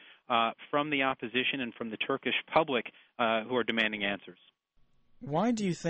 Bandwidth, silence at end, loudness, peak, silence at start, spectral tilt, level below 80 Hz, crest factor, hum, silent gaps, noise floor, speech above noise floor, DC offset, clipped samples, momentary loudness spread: 8.4 kHz; 0 s; -30 LUFS; -12 dBFS; 0.1 s; -5 dB/octave; -68 dBFS; 20 dB; none; none; -66 dBFS; 35 dB; under 0.1%; under 0.1%; 7 LU